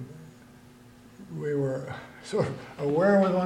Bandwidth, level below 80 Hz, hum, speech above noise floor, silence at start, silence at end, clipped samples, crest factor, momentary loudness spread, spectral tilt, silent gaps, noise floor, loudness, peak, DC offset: 12 kHz; -62 dBFS; none; 26 dB; 0 s; 0 s; under 0.1%; 16 dB; 22 LU; -7.5 dB/octave; none; -52 dBFS; -27 LUFS; -12 dBFS; under 0.1%